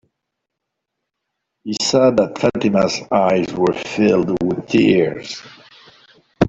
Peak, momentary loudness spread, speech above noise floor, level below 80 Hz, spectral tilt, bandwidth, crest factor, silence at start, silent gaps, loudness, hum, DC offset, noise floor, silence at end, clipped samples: -2 dBFS; 13 LU; 62 dB; -52 dBFS; -5.5 dB/octave; 8.2 kHz; 16 dB; 1.65 s; none; -17 LUFS; none; under 0.1%; -79 dBFS; 0 s; under 0.1%